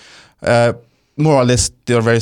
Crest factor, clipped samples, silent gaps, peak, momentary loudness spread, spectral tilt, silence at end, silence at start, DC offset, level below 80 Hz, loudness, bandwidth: 14 dB; under 0.1%; none; -2 dBFS; 14 LU; -5 dB/octave; 0 s; 0.4 s; under 0.1%; -38 dBFS; -15 LUFS; 14 kHz